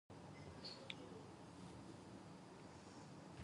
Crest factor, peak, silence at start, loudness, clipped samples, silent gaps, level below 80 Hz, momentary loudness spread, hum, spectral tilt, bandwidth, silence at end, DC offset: 28 dB; -28 dBFS; 0.1 s; -57 LUFS; under 0.1%; none; -74 dBFS; 6 LU; none; -5 dB/octave; 11 kHz; 0 s; under 0.1%